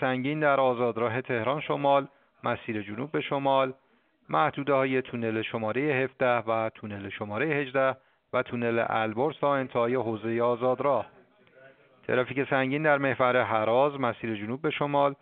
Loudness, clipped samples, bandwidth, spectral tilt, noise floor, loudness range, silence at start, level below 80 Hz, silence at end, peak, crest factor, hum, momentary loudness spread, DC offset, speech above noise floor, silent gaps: -27 LUFS; under 0.1%; 4.5 kHz; -4.5 dB/octave; -57 dBFS; 2 LU; 0 s; -70 dBFS; 0.1 s; -8 dBFS; 18 dB; none; 8 LU; under 0.1%; 30 dB; none